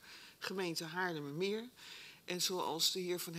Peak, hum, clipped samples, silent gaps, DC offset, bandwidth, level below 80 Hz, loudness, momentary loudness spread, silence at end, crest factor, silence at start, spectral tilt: -20 dBFS; none; under 0.1%; none; under 0.1%; 16 kHz; -86 dBFS; -38 LUFS; 17 LU; 0 s; 20 dB; 0 s; -2.5 dB/octave